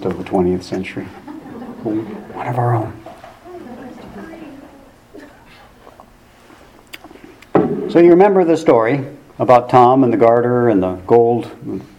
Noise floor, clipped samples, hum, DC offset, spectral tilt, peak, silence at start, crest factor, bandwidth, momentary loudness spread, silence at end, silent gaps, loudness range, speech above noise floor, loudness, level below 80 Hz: -45 dBFS; under 0.1%; none; under 0.1%; -8 dB/octave; 0 dBFS; 0 s; 16 dB; 10.5 kHz; 24 LU; 0.15 s; none; 14 LU; 32 dB; -14 LUFS; -52 dBFS